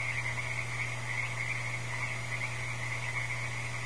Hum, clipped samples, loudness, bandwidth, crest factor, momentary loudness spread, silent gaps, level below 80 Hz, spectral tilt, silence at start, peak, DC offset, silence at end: none; under 0.1%; -34 LUFS; 11 kHz; 14 dB; 2 LU; none; -58 dBFS; -3.5 dB/octave; 0 s; -20 dBFS; 0.7%; 0 s